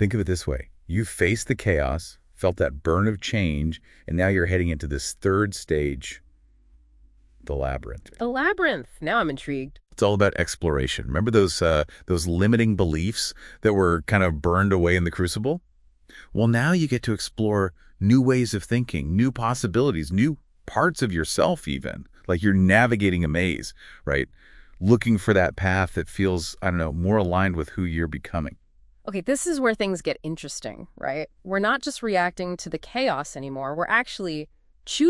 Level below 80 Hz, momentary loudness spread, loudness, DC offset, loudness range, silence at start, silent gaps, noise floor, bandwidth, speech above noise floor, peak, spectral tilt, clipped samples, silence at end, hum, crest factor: -42 dBFS; 12 LU; -24 LUFS; under 0.1%; 5 LU; 0 s; none; -56 dBFS; 12 kHz; 32 dB; -2 dBFS; -5.5 dB/octave; under 0.1%; 0 s; none; 20 dB